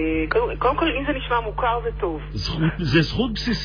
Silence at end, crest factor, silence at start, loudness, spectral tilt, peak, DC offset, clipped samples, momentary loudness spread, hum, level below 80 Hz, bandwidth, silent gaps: 0 s; 16 dB; 0 s; -22 LUFS; -6.5 dB/octave; -6 dBFS; under 0.1%; under 0.1%; 7 LU; none; -32 dBFS; 5.4 kHz; none